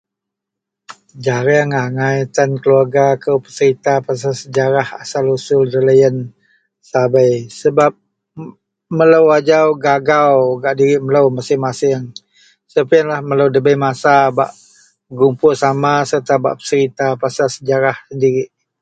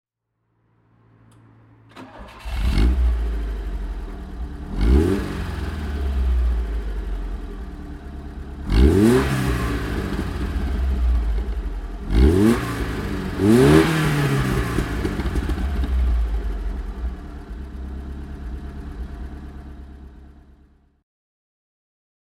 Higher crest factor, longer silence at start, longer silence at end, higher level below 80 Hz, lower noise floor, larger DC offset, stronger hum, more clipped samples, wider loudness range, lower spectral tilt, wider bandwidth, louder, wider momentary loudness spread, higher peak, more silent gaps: second, 14 dB vs 22 dB; second, 0.9 s vs 1.95 s; second, 0.35 s vs 2.05 s; second, -58 dBFS vs -24 dBFS; first, -81 dBFS vs -73 dBFS; neither; neither; neither; second, 3 LU vs 17 LU; about the same, -6 dB/octave vs -7 dB/octave; second, 9 kHz vs 15.5 kHz; first, -14 LUFS vs -22 LUFS; second, 9 LU vs 20 LU; about the same, 0 dBFS vs 0 dBFS; neither